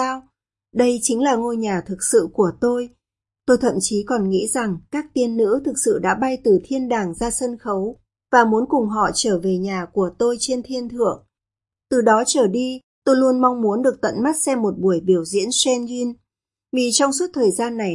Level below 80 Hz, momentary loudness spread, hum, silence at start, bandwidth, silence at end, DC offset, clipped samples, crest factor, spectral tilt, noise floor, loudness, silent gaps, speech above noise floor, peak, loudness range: -52 dBFS; 9 LU; none; 0 s; 11.5 kHz; 0 s; under 0.1%; under 0.1%; 20 dB; -4 dB/octave; -89 dBFS; -19 LUFS; 12.83-13.02 s; 70 dB; 0 dBFS; 2 LU